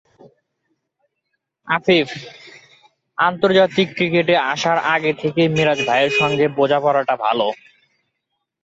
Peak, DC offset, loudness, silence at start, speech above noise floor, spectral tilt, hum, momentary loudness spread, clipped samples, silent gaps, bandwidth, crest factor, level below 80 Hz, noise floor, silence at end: -2 dBFS; under 0.1%; -17 LUFS; 1.65 s; 59 dB; -5 dB/octave; none; 8 LU; under 0.1%; none; 8 kHz; 18 dB; -60 dBFS; -76 dBFS; 1.1 s